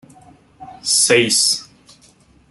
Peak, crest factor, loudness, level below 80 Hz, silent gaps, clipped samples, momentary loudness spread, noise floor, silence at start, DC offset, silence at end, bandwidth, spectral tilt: -2 dBFS; 18 dB; -14 LUFS; -60 dBFS; none; under 0.1%; 11 LU; -51 dBFS; 0.6 s; under 0.1%; 0.85 s; 12.5 kHz; -1 dB/octave